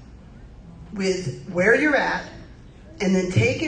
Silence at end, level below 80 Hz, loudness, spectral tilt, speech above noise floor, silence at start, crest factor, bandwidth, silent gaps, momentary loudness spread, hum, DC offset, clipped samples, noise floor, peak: 0 s; -46 dBFS; -21 LUFS; -5.5 dB/octave; 23 dB; 0 s; 18 dB; 9.4 kHz; none; 17 LU; none; under 0.1%; under 0.1%; -44 dBFS; -6 dBFS